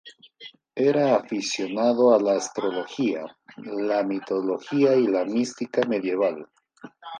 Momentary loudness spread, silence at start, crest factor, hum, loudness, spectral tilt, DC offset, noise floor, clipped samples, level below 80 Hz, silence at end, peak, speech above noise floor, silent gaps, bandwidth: 19 LU; 0.05 s; 18 dB; none; -24 LUFS; -5 dB/octave; under 0.1%; -48 dBFS; under 0.1%; -76 dBFS; 0 s; -6 dBFS; 25 dB; none; 10 kHz